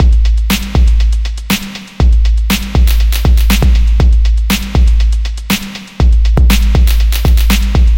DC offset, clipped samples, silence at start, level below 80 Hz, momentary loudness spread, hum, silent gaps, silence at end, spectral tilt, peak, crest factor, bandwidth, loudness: under 0.1%; under 0.1%; 0 s; -10 dBFS; 6 LU; none; none; 0 s; -5 dB/octave; 0 dBFS; 8 dB; 17 kHz; -12 LUFS